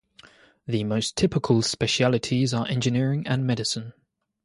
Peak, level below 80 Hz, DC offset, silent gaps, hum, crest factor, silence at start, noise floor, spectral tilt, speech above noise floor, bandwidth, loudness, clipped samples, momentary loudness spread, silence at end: -8 dBFS; -54 dBFS; under 0.1%; none; none; 18 dB; 0.25 s; -53 dBFS; -5 dB/octave; 30 dB; 11.5 kHz; -24 LUFS; under 0.1%; 7 LU; 0.55 s